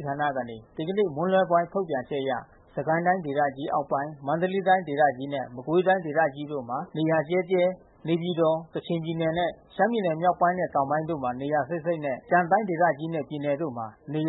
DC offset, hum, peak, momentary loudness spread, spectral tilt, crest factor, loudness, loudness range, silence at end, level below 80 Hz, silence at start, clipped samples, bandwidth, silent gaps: under 0.1%; none; -8 dBFS; 9 LU; -11 dB/octave; 18 dB; -26 LUFS; 1 LU; 0 s; -64 dBFS; 0 s; under 0.1%; 4.1 kHz; none